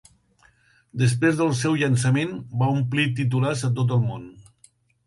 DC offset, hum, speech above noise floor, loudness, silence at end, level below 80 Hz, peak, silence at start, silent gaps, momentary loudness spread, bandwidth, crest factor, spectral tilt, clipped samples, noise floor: under 0.1%; none; 38 dB; -22 LUFS; 0.65 s; -58 dBFS; -8 dBFS; 0.95 s; none; 6 LU; 11.5 kHz; 16 dB; -6 dB/octave; under 0.1%; -60 dBFS